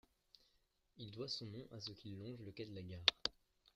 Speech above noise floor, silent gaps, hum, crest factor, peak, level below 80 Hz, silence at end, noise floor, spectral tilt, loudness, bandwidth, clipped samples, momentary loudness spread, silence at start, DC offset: 34 dB; none; none; 34 dB; -12 dBFS; -74 dBFS; 0.45 s; -80 dBFS; -3.5 dB/octave; -43 LUFS; 15 kHz; under 0.1%; 16 LU; 0.95 s; under 0.1%